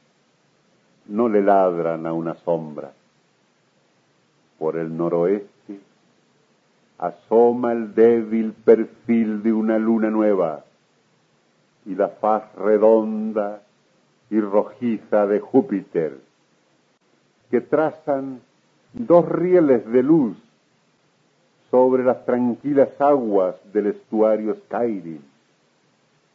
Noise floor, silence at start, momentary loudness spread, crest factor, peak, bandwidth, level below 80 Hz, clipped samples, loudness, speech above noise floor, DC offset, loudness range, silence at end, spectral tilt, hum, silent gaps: -62 dBFS; 1.1 s; 14 LU; 20 dB; -2 dBFS; 6.4 kHz; -72 dBFS; under 0.1%; -20 LUFS; 43 dB; under 0.1%; 8 LU; 1.15 s; -10 dB/octave; none; none